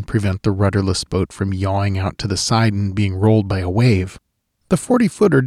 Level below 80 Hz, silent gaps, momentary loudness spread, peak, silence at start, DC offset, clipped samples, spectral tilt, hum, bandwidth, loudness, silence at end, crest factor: -42 dBFS; none; 6 LU; -4 dBFS; 0 s; under 0.1%; under 0.1%; -6 dB/octave; none; 12.5 kHz; -18 LUFS; 0 s; 14 dB